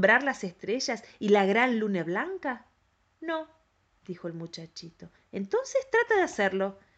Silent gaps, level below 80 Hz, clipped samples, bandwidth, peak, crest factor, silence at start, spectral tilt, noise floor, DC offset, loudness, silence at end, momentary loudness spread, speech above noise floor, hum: none; -70 dBFS; under 0.1%; 8.4 kHz; -8 dBFS; 20 dB; 0 s; -4.5 dB/octave; -70 dBFS; under 0.1%; -28 LUFS; 0.25 s; 18 LU; 42 dB; none